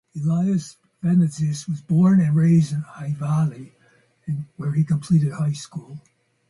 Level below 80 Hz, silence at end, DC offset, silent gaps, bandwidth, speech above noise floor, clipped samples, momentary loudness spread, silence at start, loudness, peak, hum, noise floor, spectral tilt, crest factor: -60 dBFS; 0.5 s; under 0.1%; none; 11.5 kHz; 39 dB; under 0.1%; 17 LU; 0.15 s; -21 LUFS; -8 dBFS; none; -59 dBFS; -8 dB/octave; 12 dB